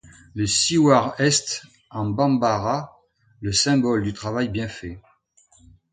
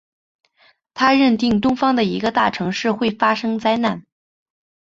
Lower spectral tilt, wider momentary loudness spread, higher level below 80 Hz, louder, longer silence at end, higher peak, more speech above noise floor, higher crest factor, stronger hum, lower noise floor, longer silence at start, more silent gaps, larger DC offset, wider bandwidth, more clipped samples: second, -4 dB/octave vs -5.5 dB/octave; first, 17 LU vs 6 LU; about the same, -50 dBFS vs -54 dBFS; second, -21 LUFS vs -18 LUFS; about the same, 0.95 s vs 0.85 s; about the same, 0 dBFS vs -2 dBFS; about the same, 38 dB vs 40 dB; about the same, 22 dB vs 18 dB; neither; about the same, -59 dBFS vs -57 dBFS; second, 0.35 s vs 0.95 s; neither; neither; first, 9.6 kHz vs 7.6 kHz; neither